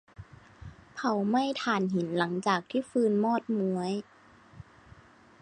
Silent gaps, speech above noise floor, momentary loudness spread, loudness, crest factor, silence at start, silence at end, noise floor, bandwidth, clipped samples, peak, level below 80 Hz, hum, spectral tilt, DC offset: none; 27 dB; 13 LU; -29 LUFS; 20 dB; 0.2 s; 0.8 s; -56 dBFS; 10 kHz; under 0.1%; -12 dBFS; -62 dBFS; none; -6 dB/octave; under 0.1%